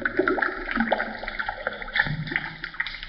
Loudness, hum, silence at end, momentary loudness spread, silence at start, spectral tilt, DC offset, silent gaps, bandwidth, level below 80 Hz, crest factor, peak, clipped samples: -27 LUFS; none; 0 s; 6 LU; 0 s; -2.5 dB/octave; under 0.1%; none; 6 kHz; -44 dBFS; 22 dB; -6 dBFS; under 0.1%